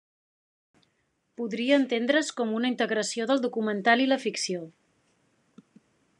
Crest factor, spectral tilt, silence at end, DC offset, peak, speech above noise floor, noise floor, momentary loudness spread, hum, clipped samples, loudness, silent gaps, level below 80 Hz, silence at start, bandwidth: 20 dB; -3.5 dB/octave; 1.5 s; under 0.1%; -8 dBFS; 47 dB; -74 dBFS; 10 LU; none; under 0.1%; -26 LUFS; none; -88 dBFS; 1.4 s; 11 kHz